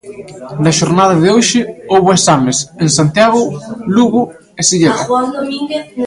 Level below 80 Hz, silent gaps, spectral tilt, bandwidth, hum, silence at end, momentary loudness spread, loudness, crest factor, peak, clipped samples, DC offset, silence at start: -48 dBFS; none; -4.5 dB/octave; 11.5 kHz; none; 0 s; 10 LU; -12 LUFS; 12 dB; 0 dBFS; under 0.1%; under 0.1%; 0.05 s